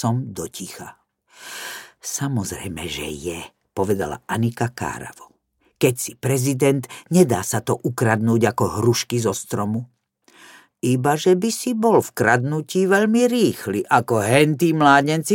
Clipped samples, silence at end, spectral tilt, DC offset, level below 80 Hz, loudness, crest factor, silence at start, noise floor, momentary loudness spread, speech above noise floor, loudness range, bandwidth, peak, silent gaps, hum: under 0.1%; 0 s; -5 dB/octave; under 0.1%; -54 dBFS; -20 LUFS; 18 dB; 0 s; -64 dBFS; 15 LU; 45 dB; 9 LU; 17 kHz; -2 dBFS; none; none